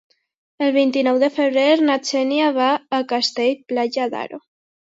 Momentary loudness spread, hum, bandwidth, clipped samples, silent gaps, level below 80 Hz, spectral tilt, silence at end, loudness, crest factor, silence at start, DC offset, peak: 8 LU; none; 8 kHz; under 0.1%; none; -74 dBFS; -3 dB/octave; 0.45 s; -19 LUFS; 16 dB; 0.6 s; under 0.1%; -4 dBFS